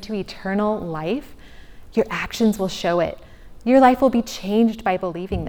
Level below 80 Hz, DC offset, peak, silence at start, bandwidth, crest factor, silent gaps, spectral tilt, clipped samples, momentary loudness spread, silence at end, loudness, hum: -42 dBFS; under 0.1%; -2 dBFS; 0 s; 20 kHz; 18 dB; none; -6 dB/octave; under 0.1%; 13 LU; 0 s; -21 LUFS; none